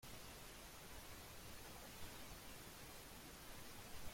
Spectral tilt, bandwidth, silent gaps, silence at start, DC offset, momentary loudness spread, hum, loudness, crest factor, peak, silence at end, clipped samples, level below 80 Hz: -3 dB/octave; 16.5 kHz; none; 0 s; under 0.1%; 1 LU; none; -56 LUFS; 16 dB; -38 dBFS; 0 s; under 0.1%; -64 dBFS